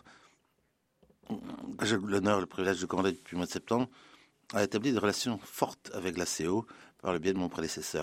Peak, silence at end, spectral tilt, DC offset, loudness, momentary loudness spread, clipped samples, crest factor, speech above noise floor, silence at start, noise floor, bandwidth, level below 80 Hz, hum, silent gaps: -12 dBFS; 0 s; -4.5 dB/octave; under 0.1%; -33 LUFS; 10 LU; under 0.1%; 22 dB; 43 dB; 0.05 s; -75 dBFS; 16 kHz; -66 dBFS; none; none